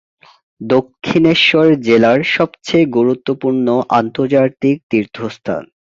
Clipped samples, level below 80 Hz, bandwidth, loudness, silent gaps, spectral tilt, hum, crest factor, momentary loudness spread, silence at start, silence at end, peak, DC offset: under 0.1%; -52 dBFS; 7.6 kHz; -14 LUFS; 4.83-4.89 s; -6 dB/octave; none; 14 dB; 13 LU; 0.6 s; 0.3 s; 0 dBFS; under 0.1%